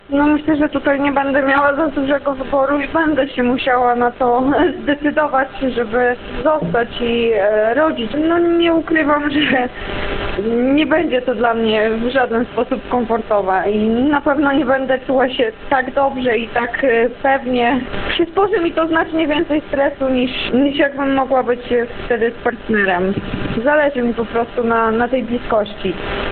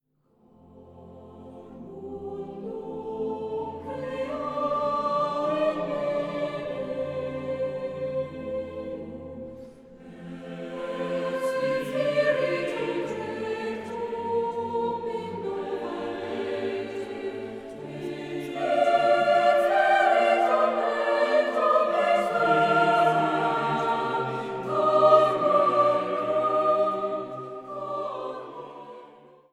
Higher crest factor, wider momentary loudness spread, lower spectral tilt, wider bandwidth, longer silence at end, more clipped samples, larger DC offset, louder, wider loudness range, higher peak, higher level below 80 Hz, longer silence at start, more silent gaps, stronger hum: about the same, 16 dB vs 20 dB; second, 5 LU vs 17 LU; first, -10 dB/octave vs -5.5 dB/octave; second, 4.5 kHz vs 12.5 kHz; second, 0 s vs 0.4 s; neither; neither; first, -16 LUFS vs -26 LUFS; second, 1 LU vs 12 LU; first, 0 dBFS vs -6 dBFS; first, -38 dBFS vs -64 dBFS; second, 0.1 s vs 0.75 s; neither; neither